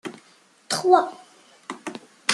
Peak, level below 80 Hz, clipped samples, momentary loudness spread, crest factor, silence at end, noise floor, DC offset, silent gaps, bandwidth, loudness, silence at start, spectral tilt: -2 dBFS; -78 dBFS; under 0.1%; 21 LU; 22 dB; 0 s; -57 dBFS; under 0.1%; none; 12.5 kHz; -21 LUFS; 0.05 s; -2.5 dB/octave